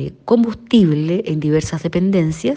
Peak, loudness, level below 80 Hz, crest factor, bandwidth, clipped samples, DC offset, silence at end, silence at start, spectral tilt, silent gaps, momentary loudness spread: -2 dBFS; -17 LUFS; -44 dBFS; 14 dB; 9.4 kHz; under 0.1%; under 0.1%; 0 s; 0 s; -7 dB/octave; none; 5 LU